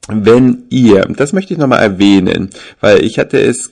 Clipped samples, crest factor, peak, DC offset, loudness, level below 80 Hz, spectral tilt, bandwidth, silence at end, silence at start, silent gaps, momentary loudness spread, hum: 0.5%; 10 dB; 0 dBFS; under 0.1%; -10 LUFS; -42 dBFS; -6 dB/octave; 11 kHz; 0.05 s; 0.1 s; none; 7 LU; none